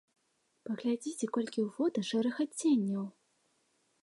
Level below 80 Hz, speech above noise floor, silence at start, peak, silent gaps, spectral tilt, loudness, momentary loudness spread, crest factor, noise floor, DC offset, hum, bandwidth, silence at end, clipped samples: -86 dBFS; 44 dB; 0.65 s; -20 dBFS; none; -5 dB/octave; -33 LUFS; 10 LU; 16 dB; -77 dBFS; under 0.1%; none; 11.5 kHz; 0.95 s; under 0.1%